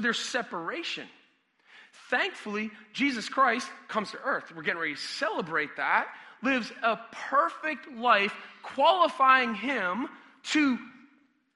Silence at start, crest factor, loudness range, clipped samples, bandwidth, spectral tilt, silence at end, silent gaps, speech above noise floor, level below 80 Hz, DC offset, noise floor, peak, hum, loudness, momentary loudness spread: 0 s; 22 dB; 5 LU; under 0.1%; 11.5 kHz; -3 dB/octave; 0.65 s; none; 37 dB; -78 dBFS; under 0.1%; -66 dBFS; -8 dBFS; none; -28 LUFS; 12 LU